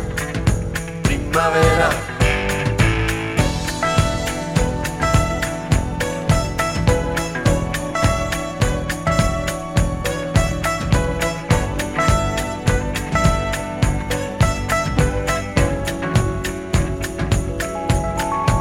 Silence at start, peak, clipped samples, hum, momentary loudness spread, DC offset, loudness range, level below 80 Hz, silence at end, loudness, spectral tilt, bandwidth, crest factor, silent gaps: 0 s; -2 dBFS; under 0.1%; none; 5 LU; under 0.1%; 2 LU; -26 dBFS; 0 s; -20 LUFS; -5 dB/octave; 17 kHz; 16 dB; none